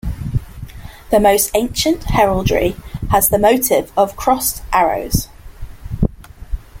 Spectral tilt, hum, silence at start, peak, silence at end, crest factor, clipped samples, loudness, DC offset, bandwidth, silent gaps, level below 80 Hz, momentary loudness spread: -4.5 dB/octave; none; 0.05 s; 0 dBFS; 0 s; 16 dB; under 0.1%; -16 LUFS; under 0.1%; 17 kHz; none; -28 dBFS; 19 LU